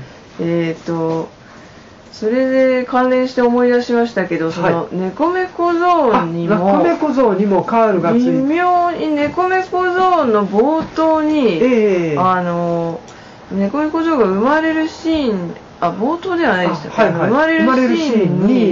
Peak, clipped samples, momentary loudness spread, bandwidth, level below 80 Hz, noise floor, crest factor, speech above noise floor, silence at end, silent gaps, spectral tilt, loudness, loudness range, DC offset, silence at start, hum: -4 dBFS; under 0.1%; 7 LU; 7.6 kHz; -50 dBFS; -39 dBFS; 12 dB; 25 dB; 0 s; none; -5 dB/octave; -15 LUFS; 3 LU; under 0.1%; 0 s; none